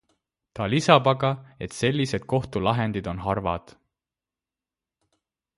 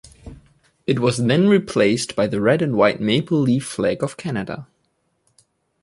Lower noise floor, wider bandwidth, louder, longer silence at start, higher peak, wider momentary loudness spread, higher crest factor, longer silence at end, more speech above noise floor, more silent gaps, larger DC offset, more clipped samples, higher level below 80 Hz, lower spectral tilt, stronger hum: first, under -90 dBFS vs -68 dBFS; about the same, 11.5 kHz vs 11.5 kHz; second, -24 LUFS vs -19 LUFS; first, 0.55 s vs 0.25 s; first, 0 dBFS vs -4 dBFS; first, 15 LU vs 10 LU; first, 26 dB vs 18 dB; first, 2 s vs 1.2 s; first, over 66 dB vs 50 dB; neither; neither; neither; about the same, -50 dBFS vs -52 dBFS; about the same, -6 dB/octave vs -6 dB/octave; neither